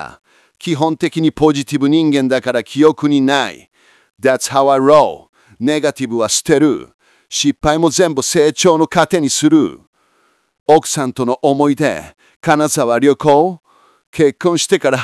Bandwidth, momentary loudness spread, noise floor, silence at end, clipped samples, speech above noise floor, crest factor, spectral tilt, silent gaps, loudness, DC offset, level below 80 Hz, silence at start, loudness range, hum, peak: 12 kHz; 9 LU; -58 dBFS; 0 s; under 0.1%; 45 dB; 14 dB; -4.5 dB/octave; 5.29-5.33 s, 6.94-6.99 s, 9.87-9.93 s, 10.60-10.66 s, 12.36-12.40 s, 14.07-14.13 s; -14 LUFS; under 0.1%; -48 dBFS; 0 s; 2 LU; none; 0 dBFS